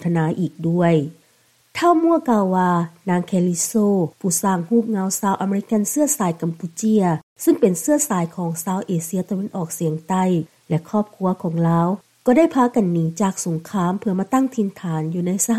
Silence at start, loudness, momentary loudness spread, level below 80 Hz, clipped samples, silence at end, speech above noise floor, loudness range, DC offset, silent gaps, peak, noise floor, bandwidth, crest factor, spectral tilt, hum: 0 s; -20 LUFS; 7 LU; -64 dBFS; under 0.1%; 0 s; 39 dB; 3 LU; under 0.1%; 7.23-7.36 s; -4 dBFS; -58 dBFS; 15 kHz; 16 dB; -6 dB/octave; none